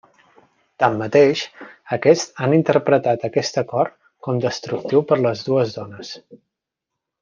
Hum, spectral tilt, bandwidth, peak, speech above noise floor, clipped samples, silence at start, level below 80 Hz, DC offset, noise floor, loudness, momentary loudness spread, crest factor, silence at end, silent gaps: none; -5.5 dB/octave; 7.4 kHz; -2 dBFS; 64 dB; under 0.1%; 0.8 s; -64 dBFS; under 0.1%; -83 dBFS; -19 LUFS; 16 LU; 18 dB; 0.85 s; none